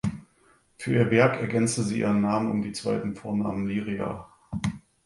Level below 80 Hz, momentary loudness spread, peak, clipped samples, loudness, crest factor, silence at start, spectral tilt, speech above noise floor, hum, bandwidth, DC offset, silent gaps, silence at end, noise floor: -54 dBFS; 12 LU; -6 dBFS; under 0.1%; -26 LUFS; 22 dB; 0.05 s; -6 dB/octave; 37 dB; none; 11.5 kHz; under 0.1%; none; 0.3 s; -62 dBFS